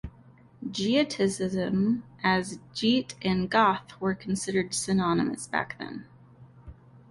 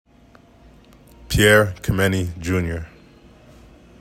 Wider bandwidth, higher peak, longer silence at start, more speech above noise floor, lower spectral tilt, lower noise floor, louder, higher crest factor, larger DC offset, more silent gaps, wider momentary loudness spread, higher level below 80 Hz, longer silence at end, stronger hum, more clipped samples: second, 11.5 kHz vs 16.5 kHz; second, -10 dBFS vs -2 dBFS; second, 0.05 s vs 1.3 s; second, 28 dB vs 32 dB; about the same, -4.5 dB/octave vs -5 dB/octave; first, -54 dBFS vs -50 dBFS; second, -27 LUFS vs -19 LUFS; about the same, 18 dB vs 20 dB; neither; neither; second, 12 LU vs 15 LU; second, -56 dBFS vs -38 dBFS; second, 0.4 s vs 1.15 s; neither; neither